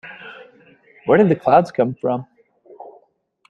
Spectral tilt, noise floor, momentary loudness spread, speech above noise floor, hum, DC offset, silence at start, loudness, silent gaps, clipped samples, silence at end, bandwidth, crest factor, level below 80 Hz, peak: -8.5 dB/octave; -60 dBFS; 22 LU; 44 dB; none; under 0.1%; 0.05 s; -17 LUFS; none; under 0.1%; 0.6 s; 9.2 kHz; 20 dB; -60 dBFS; 0 dBFS